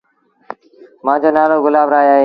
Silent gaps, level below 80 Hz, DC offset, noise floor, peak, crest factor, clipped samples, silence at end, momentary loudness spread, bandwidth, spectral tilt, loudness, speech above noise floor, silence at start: none; -64 dBFS; under 0.1%; -44 dBFS; 0 dBFS; 14 dB; under 0.1%; 0 s; 23 LU; 5.2 kHz; -8 dB/octave; -13 LUFS; 33 dB; 1.05 s